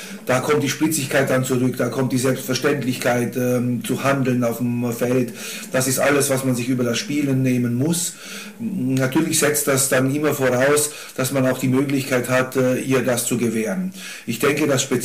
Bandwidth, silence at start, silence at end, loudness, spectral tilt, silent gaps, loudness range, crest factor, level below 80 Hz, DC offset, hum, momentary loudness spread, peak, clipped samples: 16 kHz; 0 s; 0 s; -20 LUFS; -4.5 dB/octave; none; 2 LU; 14 dB; -62 dBFS; 0.3%; none; 7 LU; -6 dBFS; under 0.1%